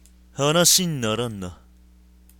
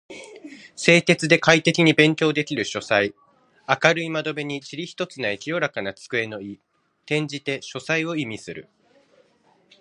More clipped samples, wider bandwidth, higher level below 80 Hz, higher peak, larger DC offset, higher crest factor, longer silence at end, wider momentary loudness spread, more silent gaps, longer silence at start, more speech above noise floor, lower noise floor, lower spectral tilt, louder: neither; first, 17.5 kHz vs 11 kHz; first, -50 dBFS vs -64 dBFS; second, -4 dBFS vs 0 dBFS; neither; about the same, 20 dB vs 24 dB; second, 0.85 s vs 1.2 s; about the same, 21 LU vs 22 LU; neither; first, 0.35 s vs 0.1 s; second, 31 dB vs 39 dB; second, -52 dBFS vs -61 dBFS; second, -3 dB/octave vs -4.5 dB/octave; about the same, -19 LUFS vs -21 LUFS